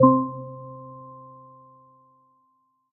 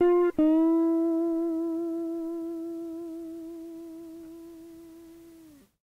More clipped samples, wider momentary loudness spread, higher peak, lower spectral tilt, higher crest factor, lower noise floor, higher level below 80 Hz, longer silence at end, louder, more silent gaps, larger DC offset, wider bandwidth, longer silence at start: neither; about the same, 25 LU vs 24 LU; first, -4 dBFS vs -16 dBFS; first, -15 dB/octave vs -7 dB/octave; first, 24 dB vs 12 dB; first, -68 dBFS vs -53 dBFS; about the same, -68 dBFS vs -64 dBFS; first, 2.1 s vs 0.35 s; about the same, -26 LUFS vs -27 LUFS; neither; neither; second, 1.7 kHz vs 3.8 kHz; about the same, 0 s vs 0 s